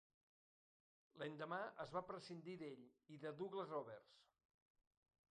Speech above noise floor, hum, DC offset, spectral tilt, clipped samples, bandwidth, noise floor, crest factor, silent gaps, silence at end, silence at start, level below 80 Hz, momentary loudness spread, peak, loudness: over 38 dB; none; under 0.1%; -6 dB/octave; under 0.1%; 9.4 kHz; under -90 dBFS; 22 dB; none; 1.1 s; 1.15 s; -90 dBFS; 10 LU; -32 dBFS; -52 LUFS